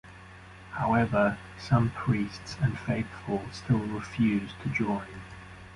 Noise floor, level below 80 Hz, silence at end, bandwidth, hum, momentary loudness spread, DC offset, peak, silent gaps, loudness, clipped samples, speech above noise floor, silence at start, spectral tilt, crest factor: -48 dBFS; -50 dBFS; 0 s; 11.5 kHz; none; 19 LU; under 0.1%; -10 dBFS; none; -29 LUFS; under 0.1%; 20 dB; 0.05 s; -7.5 dB/octave; 20 dB